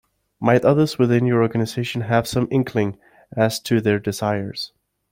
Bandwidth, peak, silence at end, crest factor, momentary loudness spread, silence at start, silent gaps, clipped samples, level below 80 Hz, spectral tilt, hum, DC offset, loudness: 16.5 kHz; -2 dBFS; 0.45 s; 18 dB; 9 LU; 0.4 s; none; under 0.1%; -54 dBFS; -6.5 dB/octave; none; under 0.1%; -20 LUFS